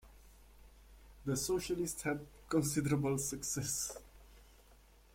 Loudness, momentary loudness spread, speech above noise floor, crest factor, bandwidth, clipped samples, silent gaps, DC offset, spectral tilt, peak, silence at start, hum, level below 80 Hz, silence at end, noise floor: -37 LUFS; 8 LU; 26 dB; 20 dB; 16.5 kHz; under 0.1%; none; under 0.1%; -4.5 dB/octave; -20 dBFS; 0.05 s; none; -58 dBFS; 0.4 s; -63 dBFS